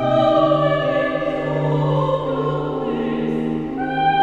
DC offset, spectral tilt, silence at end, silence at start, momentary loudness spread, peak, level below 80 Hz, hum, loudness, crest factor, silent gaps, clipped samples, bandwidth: 0.1%; -8 dB/octave; 0 s; 0 s; 7 LU; -4 dBFS; -44 dBFS; none; -20 LUFS; 14 dB; none; under 0.1%; 7.4 kHz